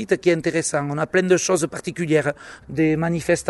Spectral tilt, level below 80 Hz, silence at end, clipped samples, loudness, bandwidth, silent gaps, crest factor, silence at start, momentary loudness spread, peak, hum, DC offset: -5 dB/octave; -52 dBFS; 0 s; under 0.1%; -21 LUFS; 11.5 kHz; none; 16 dB; 0 s; 9 LU; -4 dBFS; none; under 0.1%